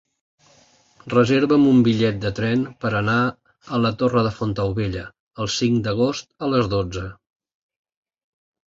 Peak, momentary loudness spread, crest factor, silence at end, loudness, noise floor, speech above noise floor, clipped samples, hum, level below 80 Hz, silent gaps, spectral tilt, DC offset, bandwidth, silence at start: -4 dBFS; 11 LU; 18 dB; 1.55 s; -20 LUFS; -56 dBFS; 36 dB; under 0.1%; none; -46 dBFS; 5.20-5.31 s; -6.5 dB/octave; under 0.1%; 7.8 kHz; 1.05 s